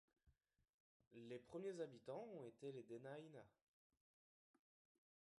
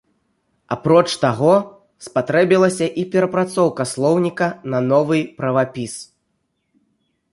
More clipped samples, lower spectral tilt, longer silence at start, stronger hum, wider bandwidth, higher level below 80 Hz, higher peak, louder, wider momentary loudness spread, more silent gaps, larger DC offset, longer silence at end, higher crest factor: neither; about the same, -6.5 dB/octave vs -6 dB/octave; second, 0.25 s vs 0.7 s; neither; about the same, 11 kHz vs 11.5 kHz; second, under -90 dBFS vs -60 dBFS; second, -38 dBFS vs -2 dBFS; second, -56 LUFS vs -18 LUFS; about the same, 12 LU vs 12 LU; first, 0.74-1.00 s, 1.07-1.11 s vs none; neither; first, 1.9 s vs 1.3 s; about the same, 20 dB vs 18 dB